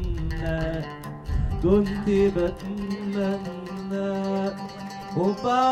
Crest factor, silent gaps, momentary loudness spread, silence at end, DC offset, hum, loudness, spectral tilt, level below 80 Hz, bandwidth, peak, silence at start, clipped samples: 16 dB; none; 12 LU; 0 s; under 0.1%; none; -26 LUFS; -7.5 dB/octave; -34 dBFS; 13 kHz; -8 dBFS; 0 s; under 0.1%